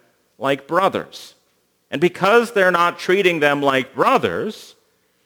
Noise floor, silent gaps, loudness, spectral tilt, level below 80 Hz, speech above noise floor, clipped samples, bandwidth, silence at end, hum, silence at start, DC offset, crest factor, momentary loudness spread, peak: -64 dBFS; none; -18 LUFS; -5 dB/octave; -66 dBFS; 46 dB; under 0.1%; over 20 kHz; 0.6 s; none; 0.4 s; under 0.1%; 18 dB; 14 LU; 0 dBFS